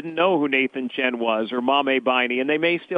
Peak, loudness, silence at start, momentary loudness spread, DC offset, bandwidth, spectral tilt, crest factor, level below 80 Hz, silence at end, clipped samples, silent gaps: -6 dBFS; -21 LUFS; 0 s; 4 LU; under 0.1%; 5 kHz; -6.5 dB/octave; 16 dB; -74 dBFS; 0 s; under 0.1%; none